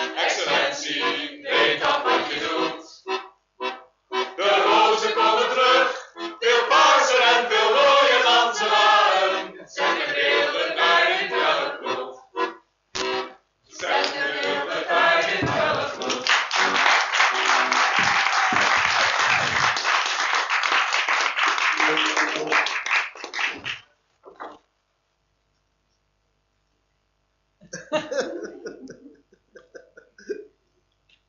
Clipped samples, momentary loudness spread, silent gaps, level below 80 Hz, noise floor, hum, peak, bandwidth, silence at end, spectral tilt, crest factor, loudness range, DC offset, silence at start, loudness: under 0.1%; 15 LU; none; -66 dBFS; -71 dBFS; none; -4 dBFS; 7.8 kHz; 0.85 s; -1.5 dB/octave; 18 dB; 16 LU; under 0.1%; 0 s; -20 LUFS